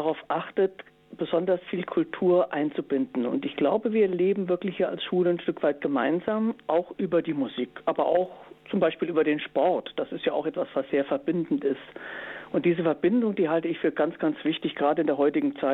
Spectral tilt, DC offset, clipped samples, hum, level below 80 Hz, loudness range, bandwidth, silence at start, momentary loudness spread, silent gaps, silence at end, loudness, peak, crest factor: -9 dB/octave; under 0.1%; under 0.1%; none; -68 dBFS; 2 LU; 4.1 kHz; 0 s; 6 LU; none; 0 s; -26 LUFS; -10 dBFS; 16 dB